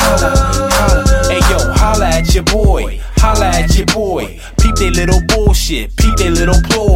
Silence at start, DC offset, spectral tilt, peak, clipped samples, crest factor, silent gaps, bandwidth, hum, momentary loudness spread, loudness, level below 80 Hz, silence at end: 0 s; under 0.1%; -4.5 dB/octave; 0 dBFS; under 0.1%; 10 dB; none; 16.5 kHz; none; 4 LU; -12 LUFS; -14 dBFS; 0 s